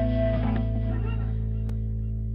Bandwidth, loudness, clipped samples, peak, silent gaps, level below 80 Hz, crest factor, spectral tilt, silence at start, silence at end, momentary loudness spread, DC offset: 4.1 kHz; -28 LUFS; under 0.1%; -14 dBFS; none; -30 dBFS; 12 dB; -10.5 dB/octave; 0 s; 0 s; 5 LU; under 0.1%